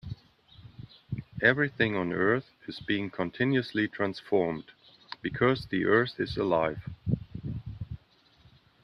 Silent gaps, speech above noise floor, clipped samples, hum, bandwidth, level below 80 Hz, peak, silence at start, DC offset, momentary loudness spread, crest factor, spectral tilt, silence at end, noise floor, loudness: none; 33 dB; under 0.1%; none; 10.5 kHz; -56 dBFS; -8 dBFS; 0.05 s; under 0.1%; 18 LU; 22 dB; -8 dB/octave; 0.9 s; -61 dBFS; -29 LUFS